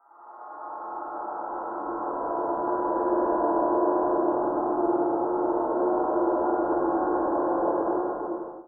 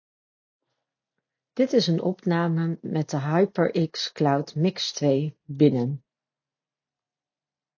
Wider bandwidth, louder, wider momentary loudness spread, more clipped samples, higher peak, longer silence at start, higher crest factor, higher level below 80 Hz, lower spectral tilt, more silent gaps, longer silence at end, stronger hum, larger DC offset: second, 2 kHz vs 7.2 kHz; about the same, -26 LUFS vs -24 LUFS; first, 10 LU vs 7 LU; neither; second, -12 dBFS vs -6 dBFS; second, 0.2 s vs 1.55 s; second, 14 dB vs 20 dB; first, -60 dBFS vs -74 dBFS; first, -13 dB/octave vs -6.5 dB/octave; neither; second, 0 s vs 1.8 s; neither; neither